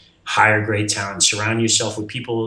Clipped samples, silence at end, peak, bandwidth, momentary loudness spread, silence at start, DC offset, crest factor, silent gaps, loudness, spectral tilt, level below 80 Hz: under 0.1%; 0 s; 0 dBFS; 11 kHz; 9 LU; 0.25 s; under 0.1%; 20 dB; none; -18 LUFS; -2.5 dB/octave; -58 dBFS